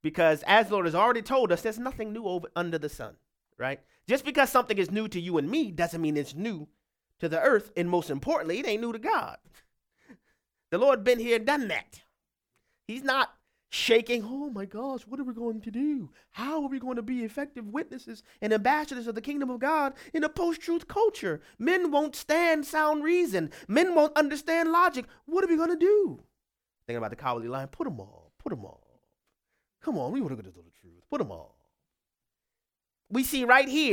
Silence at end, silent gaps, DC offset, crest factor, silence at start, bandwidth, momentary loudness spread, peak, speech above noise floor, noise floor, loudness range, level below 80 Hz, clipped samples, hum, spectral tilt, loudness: 0 s; none; under 0.1%; 22 dB; 0.05 s; 18 kHz; 13 LU; -6 dBFS; 62 dB; -90 dBFS; 12 LU; -60 dBFS; under 0.1%; none; -4.5 dB/octave; -28 LUFS